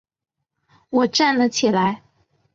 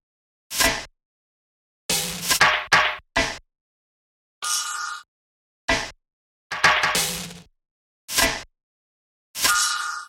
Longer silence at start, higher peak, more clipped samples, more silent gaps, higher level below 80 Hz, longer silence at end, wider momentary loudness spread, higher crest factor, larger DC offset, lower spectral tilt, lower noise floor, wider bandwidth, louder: first, 0.9 s vs 0.5 s; about the same, -6 dBFS vs -4 dBFS; neither; second, none vs 1.05-1.89 s, 3.61-4.41 s, 5.08-5.68 s, 6.13-6.50 s, 7.71-8.08 s, 8.63-9.34 s; second, -64 dBFS vs -46 dBFS; first, 0.6 s vs 0 s; second, 7 LU vs 16 LU; about the same, 16 dB vs 20 dB; neither; first, -4 dB/octave vs -0.5 dB/octave; second, -82 dBFS vs under -90 dBFS; second, 7.8 kHz vs 17 kHz; about the same, -19 LUFS vs -21 LUFS